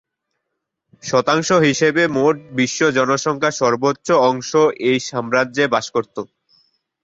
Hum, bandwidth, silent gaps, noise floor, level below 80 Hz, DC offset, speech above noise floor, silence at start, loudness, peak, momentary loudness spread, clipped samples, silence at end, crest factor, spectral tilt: none; 8 kHz; none; -77 dBFS; -60 dBFS; under 0.1%; 60 dB; 1.05 s; -17 LUFS; -2 dBFS; 7 LU; under 0.1%; 0.8 s; 16 dB; -4.5 dB/octave